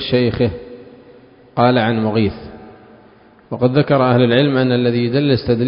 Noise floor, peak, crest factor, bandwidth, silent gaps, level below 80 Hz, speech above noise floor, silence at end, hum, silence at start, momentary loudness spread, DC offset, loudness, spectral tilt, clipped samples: -47 dBFS; 0 dBFS; 16 dB; 5.4 kHz; none; -42 dBFS; 32 dB; 0 s; none; 0 s; 18 LU; under 0.1%; -15 LUFS; -10.5 dB/octave; under 0.1%